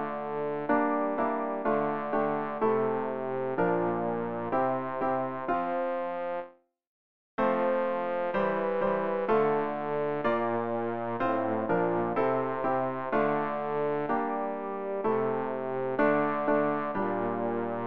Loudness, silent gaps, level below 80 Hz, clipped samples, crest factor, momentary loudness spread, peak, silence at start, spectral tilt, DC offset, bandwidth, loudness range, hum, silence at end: -29 LUFS; 6.87-7.38 s; -64 dBFS; under 0.1%; 16 dB; 5 LU; -12 dBFS; 0 s; -9.5 dB/octave; 0.4%; 5.2 kHz; 2 LU; none; 0 s